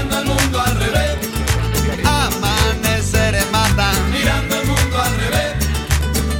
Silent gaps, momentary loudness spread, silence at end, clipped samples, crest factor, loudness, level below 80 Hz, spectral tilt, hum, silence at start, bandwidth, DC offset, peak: none; 3 LU; 0 s; under 0.1%; 12 dB; -17 LUFS; -24 dBFS; -4 dB/octave; none; 0 s; 17 kHz; under 0.1%; -4 dBFS